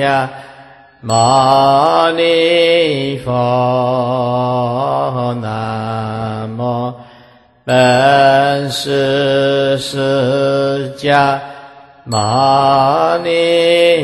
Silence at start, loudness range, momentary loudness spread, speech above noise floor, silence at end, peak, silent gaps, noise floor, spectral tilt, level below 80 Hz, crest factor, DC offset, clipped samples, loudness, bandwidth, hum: 0 s; 5 LU; 11 LU; 32 dB; 0 s; 0 dBFS; none; -45 dBFS; -5 dB/octave; -50 dBFS; 14 dB; under 0.1%; under 0.1%; -13 LUFS; 12.5 kHz; none